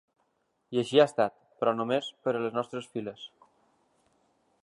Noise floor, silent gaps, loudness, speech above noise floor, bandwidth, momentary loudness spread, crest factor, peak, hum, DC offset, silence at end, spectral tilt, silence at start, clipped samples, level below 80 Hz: -75 dBFS; none; -29 LUFS; 47 dB; 11.5 kHz; 15 LU; 24 dB; -8 dBFS; none; under 0.1%; 1.35 s; -5.5 dB/octave; 0.7 s; under 0.1%; -78 dBFS